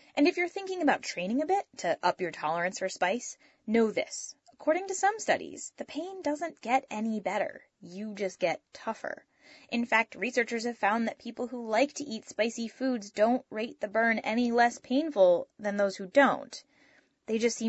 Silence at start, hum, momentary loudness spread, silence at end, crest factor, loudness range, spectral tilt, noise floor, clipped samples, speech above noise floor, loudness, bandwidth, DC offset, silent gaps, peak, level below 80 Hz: 0.15 s; none; 13 LU; 0 s; 20 dB; 6 LU; -4 dB/octave; -64 dBFS; under 0.1%; 35 dB; -30 LUFS; 8.2 kHz; under 0.1%; none; -10 dBFS; -76 dBFS